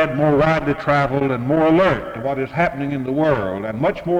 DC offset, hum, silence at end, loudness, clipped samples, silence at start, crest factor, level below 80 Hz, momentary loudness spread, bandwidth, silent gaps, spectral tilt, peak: under 0.1%; none; 0 s; -18 LUFS; under 0.1%; 0 s; 14 dB; -42 dBFS; 8 LU; 10 kHz; none; -8 dB/octave; -4 dBFS